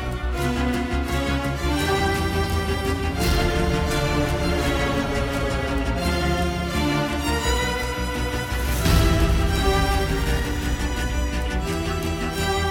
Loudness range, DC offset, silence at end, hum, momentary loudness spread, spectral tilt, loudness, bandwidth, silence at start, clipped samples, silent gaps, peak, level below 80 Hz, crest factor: 2 LU; under 0.1%; 0 s; none; 5 LU; -5 dB/octave; -23 LUFS; 17.5 kHz; 0 s; under 0.1%; none; -6 dBFS; -26 dBFS; 16 dB